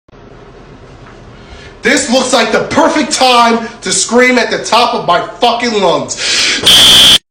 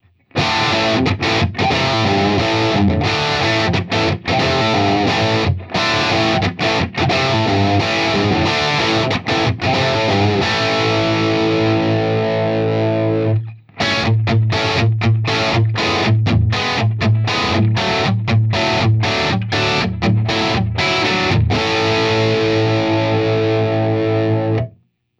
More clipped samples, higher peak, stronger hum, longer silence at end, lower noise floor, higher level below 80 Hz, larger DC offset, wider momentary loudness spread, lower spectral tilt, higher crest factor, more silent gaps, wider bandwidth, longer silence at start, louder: first, 0.3% vs under 0.1%; first, 0 dBFS vs -4 dBFS; neither; second, 0.15 s vs 0.5 s; second, -35 dBFS vs -51 dBFS; about the same, -40 dBFS vs -38 dBFS; neither; first, 10 LU vs 2 LU; second, -1.5 dB/octave vs -5.5 dB/octave; about the same, 10 dB vs 12 dB; neither; first, 19.5 kHz vs 8 kHz; about the same, 0.45 s vs 0.35 s; first, -8 LUFS vs -16 LUFS